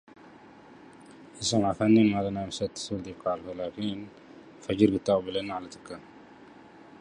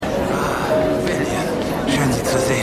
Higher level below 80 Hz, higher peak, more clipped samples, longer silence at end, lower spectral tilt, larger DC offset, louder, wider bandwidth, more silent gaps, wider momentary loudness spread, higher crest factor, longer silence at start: second, -58 dBFS vs -38 dBFS; about the same, -6 dBFS vs -6 dBFS; neither; first, 0.25 s vs 0 s; about the same, -5.5 dB/octave vs -5 dB/octave; neither; second, -28 LUFS vs -19 LUFS; second, 11 kHz vs 15.5 kHz; neither; first, 21 LU vs 3 LU; first, 22 dB vs 14 dB; first, 0.25 s vs 0 s